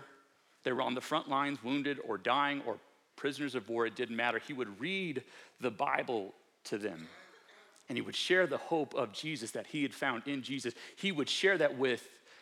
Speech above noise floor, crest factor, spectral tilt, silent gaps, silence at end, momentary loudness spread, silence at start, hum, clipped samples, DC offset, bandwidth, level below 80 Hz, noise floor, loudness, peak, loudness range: 31 dB; 22 dB; -4 dB/octave; none; 0 s; 12 LU; 0 s; none; under 0.1%; under 0.1%; 15 kHz; under -90 dBFS; -66 dBFS; -35 LUFS; -14 dBFS; 4 LU